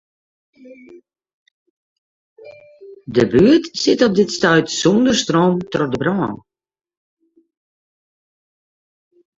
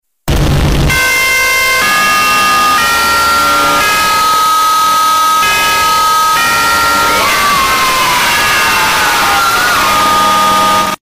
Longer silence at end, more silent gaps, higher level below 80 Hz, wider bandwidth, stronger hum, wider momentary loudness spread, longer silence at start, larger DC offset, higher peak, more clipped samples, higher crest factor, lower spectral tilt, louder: first, 3 s vs 0.05 s; first, 1.34-2.36 s vs none; second, -52 dBFS vs -26 dBFS; second, 8 kHz vs 16 kHz; neither; first, 9 LU vs 1 LU; first, 0.65 s vs 0.25 s; neither; about the same, -2 dBFS vs -4 dBFS; neither; first, 18 dB vs 6 dB; first, -5 dB/octave vs -2 dB/octave; second, -16 LUFS vs -8 LUFS